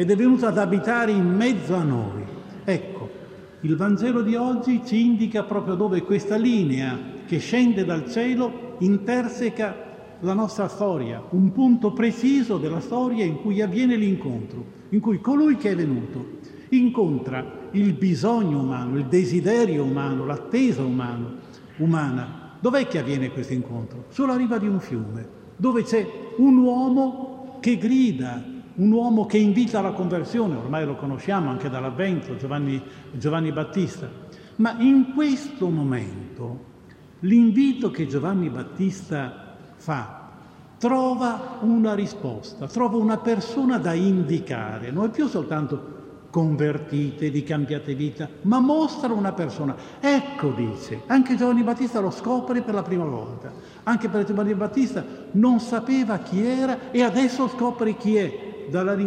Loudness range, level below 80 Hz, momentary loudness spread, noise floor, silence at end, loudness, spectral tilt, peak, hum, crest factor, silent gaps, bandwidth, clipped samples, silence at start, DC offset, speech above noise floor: 4 LU; -62 dBFS; 13 LU; -47 dBFS; 0 s; -23 LUFS; -7.5 dB/octave; -6 dBFS; none; 16 dB; none; 9.4 kHz; under 0.1%; 0 s; under 0.1%; 26 dB